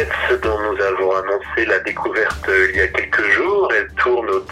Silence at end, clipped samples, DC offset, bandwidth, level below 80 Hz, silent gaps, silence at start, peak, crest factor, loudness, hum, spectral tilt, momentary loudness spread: 0 s; under 0.1%; under 0.1%; 12.5 kHz; -40 dBFS; none; 0 s; -2 dBFS; 16 dB; -17 LUFS; none; -5 dB/octave; 4 LU